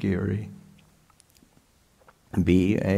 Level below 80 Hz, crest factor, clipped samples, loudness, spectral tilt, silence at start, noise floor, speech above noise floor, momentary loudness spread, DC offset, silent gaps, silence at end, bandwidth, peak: -50 dBFS; 20 dB; under 0.1%; -25 LUFS; -8 dB/octave; 0 s; -61 dBFS; 38 dB; 12 LU; under 0.1%; none; 0 s; 12.5 kHz; -8 dBFS